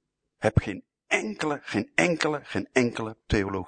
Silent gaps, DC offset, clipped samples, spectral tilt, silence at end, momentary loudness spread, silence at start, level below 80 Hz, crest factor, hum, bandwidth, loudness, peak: none; under 0.1%; under 0.1%; -5.5 dB/octave; 0 s; 7 LU; 0.4 s; -44 dBFS; 24 dB; none; 9.6 kHz; -27 LUFS; -4 dBFS